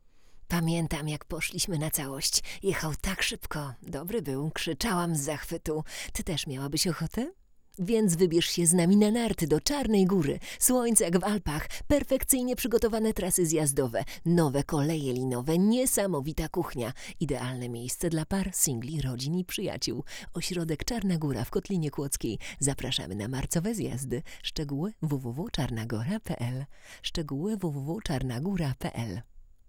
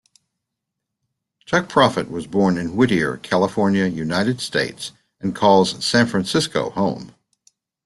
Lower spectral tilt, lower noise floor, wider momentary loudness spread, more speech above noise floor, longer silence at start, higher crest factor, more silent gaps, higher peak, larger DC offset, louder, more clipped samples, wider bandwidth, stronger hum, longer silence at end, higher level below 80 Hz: about the same, -4.5 dB/octave vs -5 dB/octave; second, -49 dBFS vs -81 dBFS; about the same, 11 LU vs 10 LU; second, 20 dB vs 62 dB; second, 0.15 s vs 1.5 s; about the same, 22 dB vs 18 dB; neither; second, -8 dBFS vs -2 dBFS; neither; second, -29 LUFS vs -19 LUFS; neither; first, over 20 kHz vs 12.5 kHz; neither; second, 0.25 s vs 0.75 s; first, -46 dBFS vs -54 dBFS